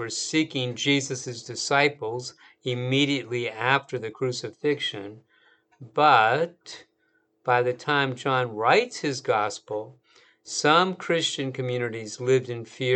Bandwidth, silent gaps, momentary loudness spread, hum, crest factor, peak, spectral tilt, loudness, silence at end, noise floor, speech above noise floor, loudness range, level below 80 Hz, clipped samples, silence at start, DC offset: 9.2 kHz; none; 14 LU; none; 22 dB; -4 dBFS; -4 dB/octave; -25 LUFS; 0 s; -69 dBFS; 44 dB; 3 LU; -78 dBFS; under 0.1%; 0 s; under 0.1%